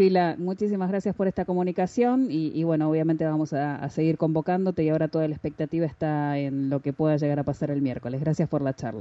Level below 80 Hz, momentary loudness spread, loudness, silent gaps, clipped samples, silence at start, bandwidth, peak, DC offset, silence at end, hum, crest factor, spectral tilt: -58 dBFS; 4 LU; -26 LUFS; none; under 0.1%; 0 s; 7.8 kHz; -10 dBFS; under 0.1%; 0 s; none; 14 dB; -8.5 dB/octave